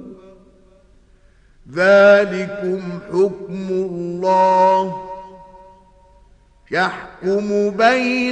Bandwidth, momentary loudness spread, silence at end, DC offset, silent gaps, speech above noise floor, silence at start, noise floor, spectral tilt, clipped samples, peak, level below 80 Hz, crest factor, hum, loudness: 9.2 kHz; 14 LU; 0 s; under 0.1%; none; 35 dB; 0 s; -51 dBFS; -6 dB/octave; under 0.1%; 0 dBFS; -54 dBFS; 18 dB; none; -17 LUFS